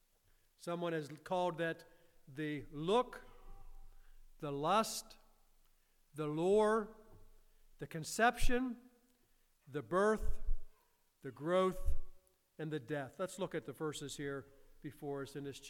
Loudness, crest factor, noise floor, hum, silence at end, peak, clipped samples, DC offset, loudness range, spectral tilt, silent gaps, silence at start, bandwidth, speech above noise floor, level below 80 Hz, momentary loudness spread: -38 LUFS; 20 dB; -73 dBFS; none; 0 s; -18 dBFS; under 0.1%; under 0.1%; 5 LU; -5 dB/octave; none; 0.6 s; 15.5 kHz; 37 dB; -46 dBFS; 17 LU